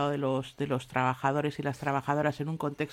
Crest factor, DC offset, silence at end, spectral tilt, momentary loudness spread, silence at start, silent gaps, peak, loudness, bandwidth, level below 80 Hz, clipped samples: 18 dB; under 0.1%; 0 s; -7 dB/octave; 5 LU; 0 s; none; -12 dBFS; -31 LUFS; 15.5 kHz; -64 dBFS; under 0.1%